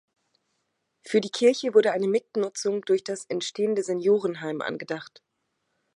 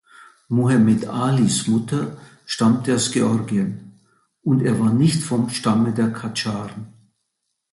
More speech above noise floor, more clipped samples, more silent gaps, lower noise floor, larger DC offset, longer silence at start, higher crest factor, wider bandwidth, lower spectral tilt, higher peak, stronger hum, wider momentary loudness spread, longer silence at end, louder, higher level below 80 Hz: second, 52 dB vs 57 dB; neither; neither; about the same, -77 dBFS vs -76 dBFS; neither; first, 1.05 s vs 0.2 s; first, 20 dB vs 14 dB; about the same, 11 kHz vs 11.5 kHz; about the same, -4.5 dB/octave vs -5.5 dB/octave; about the same, -6 dBFS vs -6 dBFS; neither; about the same, 10 LU vs 12 LU; about the same, 0.9 s vs 0.85 s; second, -25 LUFS vs -20 LUFS; second, -82 dBFS vs -56 dBFS